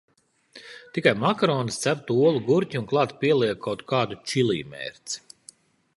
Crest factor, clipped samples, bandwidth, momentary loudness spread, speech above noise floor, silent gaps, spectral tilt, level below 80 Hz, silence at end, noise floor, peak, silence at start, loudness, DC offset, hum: 22 dB; under 0.1%; 11.5 kHz; 13 LU; 30 dB; none; -5 dB/octave; -64 dBFS; 0.8 s; -53 dBFS; -4 dBFS; 0.55 s; -24 LUFS; under 0.1%; none